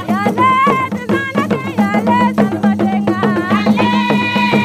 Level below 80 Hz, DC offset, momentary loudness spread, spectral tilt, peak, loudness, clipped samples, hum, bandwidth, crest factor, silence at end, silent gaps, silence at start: -50 dBFS; under 0.1%; 5 LU; -6.5 dB/octave; 0 dBFS; -14 LUFS; under 0.1%; none; 14.5 kHz; 14 dB; 0 s; none; 0 s